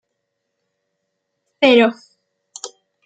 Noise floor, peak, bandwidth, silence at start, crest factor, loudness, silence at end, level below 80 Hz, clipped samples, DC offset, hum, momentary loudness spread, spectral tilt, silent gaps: -75 dBFS; 0 dBFS; 9.4 kHz; 1.6 s; 20 dB; -14 LUFS; 0.4 s; -70 dBFS; under 0.1%; under 0.1%; none; 22 LU; -3.5 dB/octave; none